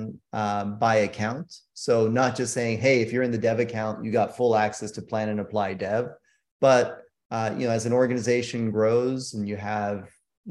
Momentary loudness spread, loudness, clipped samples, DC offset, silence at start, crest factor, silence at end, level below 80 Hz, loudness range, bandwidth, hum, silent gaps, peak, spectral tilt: 10 LU; -25 LUFS; under 0.1%; under 0.1%; 0 s; 18 dB; 0 s; -66 dBFS; 2 LU; 12 kHz; none; 6.51-6.60 s, 7.25-7.30 s, 10.37-10.44 s; -6 dBFS; -5.5 dB/octave